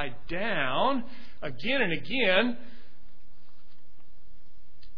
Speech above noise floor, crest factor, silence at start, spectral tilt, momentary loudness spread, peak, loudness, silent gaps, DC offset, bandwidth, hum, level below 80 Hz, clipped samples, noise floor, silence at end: 31 dB; 22 dB; 0 s; -7 dB/octave; 17 LU; -8 dBFS; -28 LUFS; none; 4%; 5.4 kHz; none; -56 dBFS; under 0.1%; -60 dBFS; 0.1 s